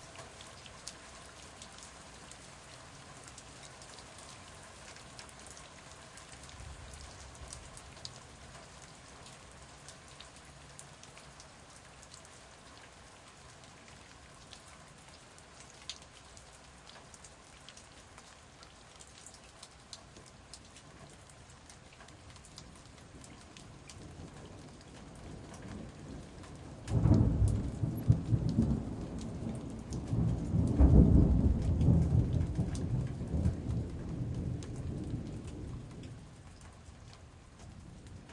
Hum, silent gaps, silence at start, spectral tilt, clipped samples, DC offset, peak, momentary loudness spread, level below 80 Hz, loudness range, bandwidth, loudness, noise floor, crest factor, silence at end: none; none; 0 s; -7 dB/octave; under 0.1%; under 0.1%; -10 dBFS; 23 LU; -42 dBFS; 23 LU; 12 kHz; -33 LUFS; -55 dBFS; 26 dB; 0 s